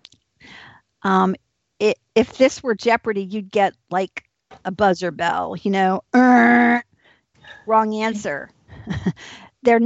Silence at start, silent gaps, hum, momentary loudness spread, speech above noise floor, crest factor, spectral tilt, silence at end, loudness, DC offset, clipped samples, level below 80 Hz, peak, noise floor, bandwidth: 1.05 s; none; none; 17 LU; 39 dB; 16 dB; -6 dB/octave; 0 s; -19 LUFS; under 0.1%; under 0.1%; -56 dBFS; -4 dBFS; -58 dBFS; 8 kHz